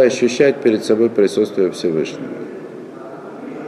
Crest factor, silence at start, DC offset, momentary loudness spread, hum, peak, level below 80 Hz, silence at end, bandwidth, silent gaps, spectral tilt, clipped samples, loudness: 16 dB; 0 s; under 0.1%; 19 LU; none; -2 dBFS; -64 dBFS; 0 s; 12.5 kHz; none; -5 dB/octave; under 0.1%; -16 LUFS